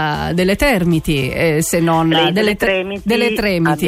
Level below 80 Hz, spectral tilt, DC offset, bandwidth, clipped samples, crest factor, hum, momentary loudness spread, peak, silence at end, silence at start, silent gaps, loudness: -34 dBFS; -5 dB/octave; under 0.1%; 16 kHz; under 0.1%; 12 dB; none; 4 LU; -4 dBFS; 0 s; 0 s; none; -15 LUFS